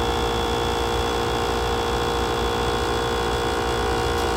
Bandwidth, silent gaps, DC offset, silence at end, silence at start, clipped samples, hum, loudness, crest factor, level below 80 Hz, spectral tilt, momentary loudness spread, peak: 16 kHz; none; under 0.1%; 0 s; 0 s; under 0.1%; 60 Hz at -40 dBFS; -23 LUFS; 12 dB; -32 dBFS; -4.5 dB/octave; 0 LU; -10 dBFS